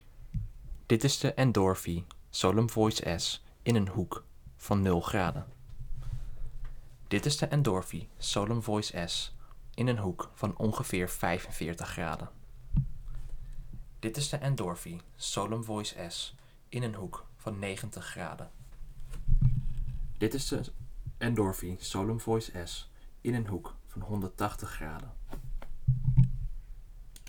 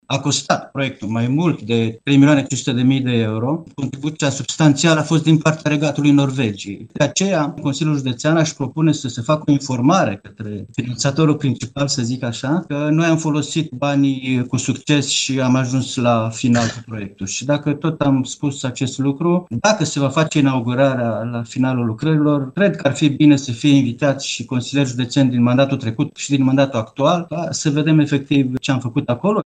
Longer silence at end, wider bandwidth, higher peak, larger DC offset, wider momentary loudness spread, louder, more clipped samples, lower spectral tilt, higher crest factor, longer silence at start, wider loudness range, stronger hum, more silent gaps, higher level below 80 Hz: about the same, 0 s vs 0.05 s; first, over 20 kHz vs 9.6 kHz; second, -10 dBFS vs 0 dBFS; neither; first, 19 LU vs 8 LU; second, -33 LUFS vs -18 LUFS; neither; about the same, -5.5 dB/octave vs -5.5 dB/octave; about the same, 22 dB vs 18 dB; about the same, 0.05 s vs 0.1 s; first, 7 LU vs 3 LU; neither; neither; first, -40 dBFS vs -56 dBFS